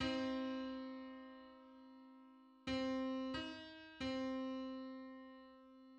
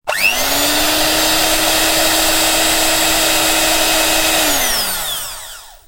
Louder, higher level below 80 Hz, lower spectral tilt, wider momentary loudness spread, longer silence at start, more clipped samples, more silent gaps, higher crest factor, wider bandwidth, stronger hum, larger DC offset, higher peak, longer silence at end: second, -45 LUFS vs -12 LUFS; second, -70 dBFS vs -32 dBFS; first, -5 dB/octave vs -0.5 dB/octave; first, 20 LU vs 6 LU; about the same, 0 s vs 0.05 s; neither; neither; about the same, 18 dB vs 14 dB; second, 8.6 kHz vs 16.5 kHz; neither; neither; second, -28 dBFS vs -2 dBFS; second, 0 s vs 0.15 s